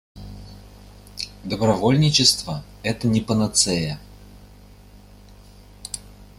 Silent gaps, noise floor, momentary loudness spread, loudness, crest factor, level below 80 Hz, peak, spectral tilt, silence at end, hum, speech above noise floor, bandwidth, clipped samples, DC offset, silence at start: none; -46 dBFS; 24 LU; -20 LUFS; 22 dB; -46 dBFS; -2 dBFS; -4 dB/octave; 0.15 s; 50 Hz at -40 dBFS; 26 dB; 15.5 kHz; under 0.1%; under 0.1%; 0.15 s